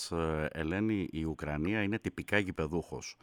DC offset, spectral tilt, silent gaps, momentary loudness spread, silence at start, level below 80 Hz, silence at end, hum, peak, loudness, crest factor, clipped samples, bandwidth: under 0.1%; -6 dB/octave; none; 5 LU; 0 s; -50 dBFS; 0.1 s; none; -14 dBFS; -34 LUFS; 20 dB; under 0.1%; 17.5 kHz